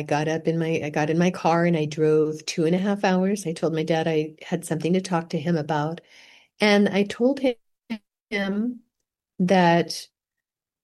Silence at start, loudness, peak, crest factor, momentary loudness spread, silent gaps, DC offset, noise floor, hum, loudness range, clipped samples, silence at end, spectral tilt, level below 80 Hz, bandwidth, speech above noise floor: 0 s; -23 LUFS; -4 dBFS; 20 dB; 11 LU; 8.23-8.27 s; under 0.1%; -87 dBFS; none; 3 LU; under 0.1%; 0.8 s; -6 dB/octave; -66 dBFS; 12.5 kHz; 64 dB